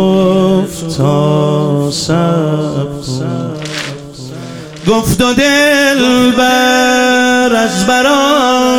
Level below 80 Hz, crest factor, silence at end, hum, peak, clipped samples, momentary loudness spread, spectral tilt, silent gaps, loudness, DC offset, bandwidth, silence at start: -38 dBFS; 10 dB; 0 s; none; 0 dBFS; under 0.1%; 11 LU; -4.5 dB/octave; none; -11 LUFS; 0.7%; 19 kHz; 0 s